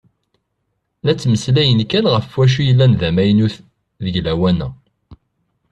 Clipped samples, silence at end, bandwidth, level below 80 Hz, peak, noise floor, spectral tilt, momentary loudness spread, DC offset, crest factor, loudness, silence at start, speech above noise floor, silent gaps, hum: under 0.1%; 0.55 s; 9.2 kHz; -42 dBFS; -2 dBFS; -71 dBFS; -7 dB/octave; 10 LU; under 0.1%; 16 dB; -15 LUFS; 1.05 s; 57 dB; none; none